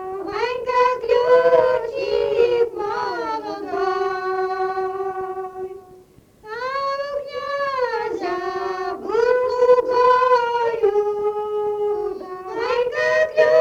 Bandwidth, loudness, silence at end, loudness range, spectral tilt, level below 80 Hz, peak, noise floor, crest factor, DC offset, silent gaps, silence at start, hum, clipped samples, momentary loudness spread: 7.6 kHz; -20 LUFS; 0 s; 8 LU; -4.5 dB/octave; -56 dBFS; -2 dBFS; -49 dBFS; 18 dB; under 0.1%; none; 0 s; none; under 0.1%; 12 LU